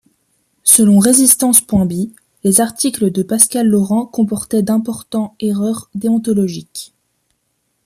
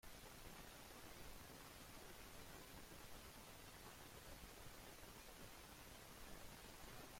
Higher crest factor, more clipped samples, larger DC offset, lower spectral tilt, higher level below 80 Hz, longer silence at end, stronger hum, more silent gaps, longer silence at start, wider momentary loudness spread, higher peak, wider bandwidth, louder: about the same, 14 dB vs 16 dB; neither; neither; first, -4.5 dB/octave vs -3 dB/octave; first, -50 dBFS vs -66 dBFS; first, 1 s vs 0 s; neither; neither; first, 0.65 s vs 0.05 s; first, 13 LU vs 1 LU; first, 0 dBFS vs -42 dBFS; about the same, 16 kHz vs 16.5 kHz; first, -13 LUFS vs -59 LUFS